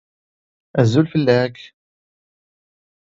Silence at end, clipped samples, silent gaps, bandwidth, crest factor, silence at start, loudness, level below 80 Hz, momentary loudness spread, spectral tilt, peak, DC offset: 1.4 s; under 0.1%; none; 7.8 kHz; 20 dB; 0.75 s; -18 LUFS; -56 dBFS; 9 LU; -7.5 dB/octave; 0 dBFS; under 0.1%